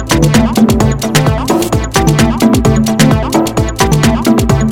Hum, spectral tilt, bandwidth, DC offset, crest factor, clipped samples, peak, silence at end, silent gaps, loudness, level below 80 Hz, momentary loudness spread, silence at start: none; -5.5 dB/octave; 19 kHz; under 0.1%; 10 dB; 1%; 0 dBFS; 0 s; none; -10 LUFS; -22 dBFS; 3 LU; 0 s